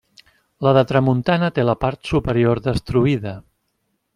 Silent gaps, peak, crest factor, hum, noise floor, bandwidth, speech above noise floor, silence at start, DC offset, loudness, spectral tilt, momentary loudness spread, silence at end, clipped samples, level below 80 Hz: none; -2 dBFS; 18 dB; none; -71 dBFS; 11.5 kHz; 53 dB; 0.6 s; under 0.1%; -19 LUFS; -8 dB/octave; 6 LU; 0.75 s; under 0.1%; -42 dBFS